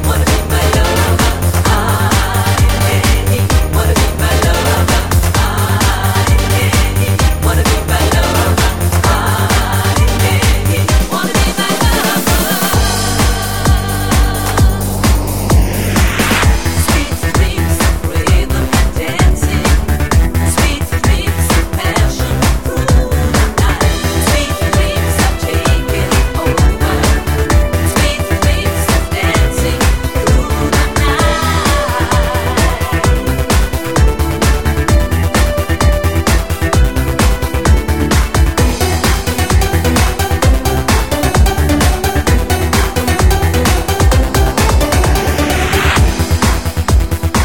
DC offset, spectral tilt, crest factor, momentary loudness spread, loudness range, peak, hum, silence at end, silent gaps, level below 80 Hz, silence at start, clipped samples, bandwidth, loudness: 3%; -4.5 dB/octave; 12 dB; 2 LU; 1 LU; 0 dBFS; none; 0 s; none; -16 dBFS; 0 s; under 0.1%; 17.5 kHz; -13 LUFS